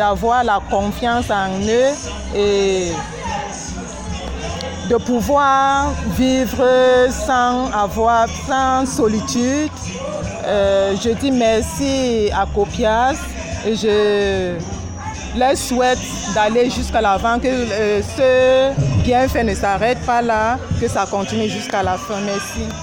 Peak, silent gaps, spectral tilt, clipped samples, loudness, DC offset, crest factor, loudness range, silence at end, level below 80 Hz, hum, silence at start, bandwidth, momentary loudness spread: -4 dBFS; none; -4.5 dB/octave; under 0.1%; -17 LUFS; under 0.1%; 12 dB; 4 LU; 0 s; -32 dBFS; none; 0 s; 17 kHz; 10 LU